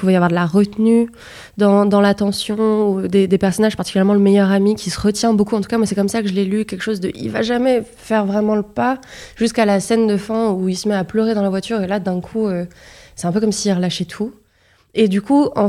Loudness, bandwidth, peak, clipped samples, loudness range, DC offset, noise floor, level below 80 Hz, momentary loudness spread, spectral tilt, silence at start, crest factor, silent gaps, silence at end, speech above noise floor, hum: -17 LUFS; 13.5 kHz; -2 dBFS; under 0.1%; 4 LU; under 0.1%; -56 dBFS; -48 dBFS; 8 LU; -6 dB/octave; 0 s; 14 dB; none; 0 s; 40 dB; none